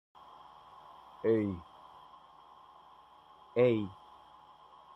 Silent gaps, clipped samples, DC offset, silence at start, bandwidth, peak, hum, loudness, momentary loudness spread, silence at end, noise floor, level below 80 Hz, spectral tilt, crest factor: none; under 0.1%; under 0.1%; 1.25 s; 5.8 kHz; -14 dBFS; none; -32 LUFS; 28 LU; 1.05 s; -59 dBFS; -72 dBFS; -9 dB/octave; 22 dB